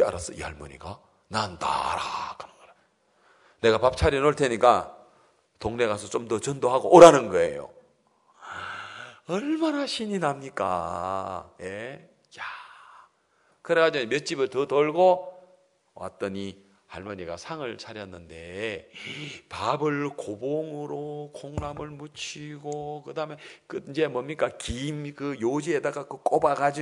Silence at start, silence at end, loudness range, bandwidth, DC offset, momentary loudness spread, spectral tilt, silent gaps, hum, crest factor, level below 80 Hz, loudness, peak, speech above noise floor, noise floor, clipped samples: 0 s; 0 s; 14 LU; 11 kHz; under 0.1%; 19 LU; -5 dB/octave; none; none; 26 dB; -52 dBFS; -25 LUFS; 0 dBFS; 41 dB; -66 dBFS; under 0.1%